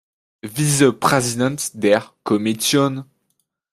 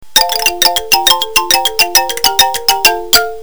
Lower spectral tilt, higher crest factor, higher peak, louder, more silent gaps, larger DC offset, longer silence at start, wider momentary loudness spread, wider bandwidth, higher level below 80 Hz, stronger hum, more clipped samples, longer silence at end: first, -4.5 dB/octave vs 1 dB/octave; first, 18 dB vs 12 dB; about the same, -2 dBFS vs 0 dBFS; second, -18 LUFS vs -9 LUFS; neither; second, under 0.1% vs 4%; first, 0.45 s vs 0.15 s; first, 9 LU vs 2 LU; second, 15.5 kHz vs over 20 kHz; second, -58 dBFS vs -40 dBFS; neither; second, under 0.1% vs 0.9%; first, 0.7 s vs 0 s